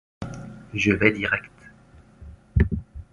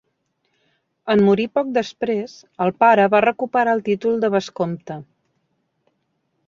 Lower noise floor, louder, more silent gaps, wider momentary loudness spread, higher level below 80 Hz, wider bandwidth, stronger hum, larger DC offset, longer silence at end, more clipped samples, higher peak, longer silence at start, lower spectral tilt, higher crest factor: second, -51 dBFS vs -71 dBFS; second, -23 LUFS vs -19 LUFS; neither; about the same, 17 LU vs 16 LU; first, -34 dBFS vs -64 dBFS; first, 11 kHz vs 7.4 kHz; neither; neither; second, 0.1 s vs 1.45 s; neither; about the same, -2 dBFS vs -2 dBFS; second, 0.2 s vs 1.05 s; about the same, -6.5 dB/octave vs -6.5 dB/octave; first, 24 dB vs 18 dB